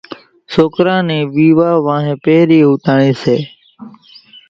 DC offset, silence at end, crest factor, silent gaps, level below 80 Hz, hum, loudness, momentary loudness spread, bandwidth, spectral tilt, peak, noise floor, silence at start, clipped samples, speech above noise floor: under 0.1%; 0.6 s; 12 dB; none; -52 dBFS; none; -12 LUFS; 7 LU; 7.2 kHz; -8 dB/octave; 0 dBFS; -41 dBFS; 0.1 s; under 0.1%; 30 dB